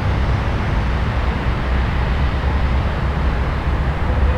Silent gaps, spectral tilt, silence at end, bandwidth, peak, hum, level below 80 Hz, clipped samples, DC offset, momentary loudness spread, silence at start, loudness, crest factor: none; -7.5 dB/octave; 0 s; 7 kHz; -6 dBFS; none; -20 dBFS; under 0.1%; under 0.1%; 1 LU; 0 s; -20 LUFS; 12 dB